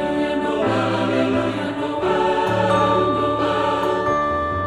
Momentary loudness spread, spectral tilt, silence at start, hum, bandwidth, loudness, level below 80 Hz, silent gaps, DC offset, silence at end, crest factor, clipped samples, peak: 4 LU; -6.5 dB/octave; 0 s; none; 13.5 kHz; -20 LUFS; -46 dBFS; none; under 0.1%; 0 s; 14 dB; under 0.1%; -6 dBFS